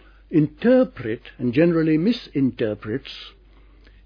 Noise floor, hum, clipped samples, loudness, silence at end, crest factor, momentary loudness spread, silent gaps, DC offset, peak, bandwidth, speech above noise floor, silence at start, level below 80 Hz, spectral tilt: -50 dBFS; none; under 0.1%; -21 LUFS; 0.75 s; 16 dB; 12 LU; none; under 0.1%; -6 dBFS; 5.4 kHz; 29 dB; 0.3 s; -50 dBFS; -9 dB/octave